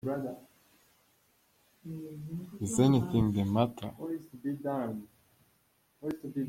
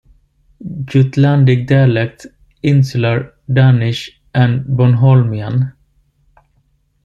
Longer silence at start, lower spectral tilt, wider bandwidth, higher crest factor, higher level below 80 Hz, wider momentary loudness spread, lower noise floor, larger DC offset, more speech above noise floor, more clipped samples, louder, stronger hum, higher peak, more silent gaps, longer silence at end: second, 0.05 s vs 0.6 s; second, -7 dB/octave vs -8.5 dB/octave; first, 16.5 kHz vs 7.2 kHz; first, 22 dB vs 12 dB; second, -60 dBFS vs -46 dBFS; first, 18 LU vs 12 LU; first, -71 dBFS vs -59 dBFS; neither; second, 39 dB vs 47 dB; neither; second, -32 LUFS vs -13 LUFS; neither; second, -12 dBFS vs -2 dBFS; neither; second, 0 s vs 1.35 s